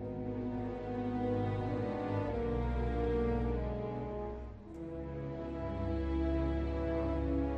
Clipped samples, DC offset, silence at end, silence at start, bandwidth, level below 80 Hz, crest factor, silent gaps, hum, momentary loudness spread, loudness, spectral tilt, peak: under 0.1%; under 0.1%; 0 s; 0 s; 6 kHz; -42 dBFS; 14 dB; none; none; 8 LU; -37 LUFS; -9.5 dB/octave; -22 dBFS